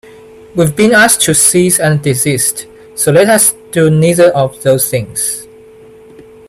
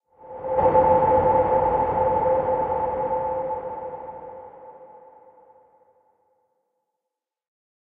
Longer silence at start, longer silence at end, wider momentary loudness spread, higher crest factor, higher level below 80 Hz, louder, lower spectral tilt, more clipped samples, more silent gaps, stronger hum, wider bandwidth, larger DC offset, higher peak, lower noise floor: first, 0.55 s vs 0.25 s; second, 1.05 s vs 2.95 s; second, 9 LU vs 21 LU; second, 12 dB vs 18 dB; about the same, -46 dBFS vs -48 dBFS; first, -9 LUFS vs -22 LUFS; second, -4 dB/octave vs -10.5 dB/octave; first, 0.1% vs under 0.1%; neither; neither; first, over 20 kHz vs 3.6 kHz; neither; first, 0 dBFS vs -6 dBFS; second, -37 dBFS vs -85 dBFS